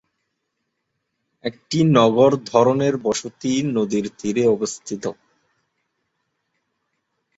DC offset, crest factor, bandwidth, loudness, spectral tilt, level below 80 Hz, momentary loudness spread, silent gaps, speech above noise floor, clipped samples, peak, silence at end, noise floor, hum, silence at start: under 0.1%; 22 dB; 8.2 kHz; -19 LUFS; -6 dB/octave; -60 dBFS; 14 LU; none; 57 dB; under 0.1%; 0 dBFS; 2.25 s; -76 dBFS; none; 1.45 s